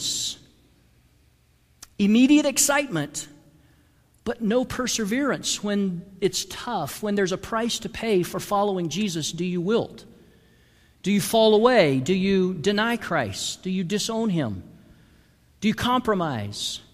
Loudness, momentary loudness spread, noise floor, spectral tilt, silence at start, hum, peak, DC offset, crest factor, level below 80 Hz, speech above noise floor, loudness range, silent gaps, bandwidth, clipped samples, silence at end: -23 LUFS; 11 LU; -61 dBFS; -4 dB/octave; 0 s; none; -4 dBFS; under 0.1%; 20 dB; -54 dBFS; 38 dB; 5 LU; none; 15.5 kHz; under 0.1%; 0.1 s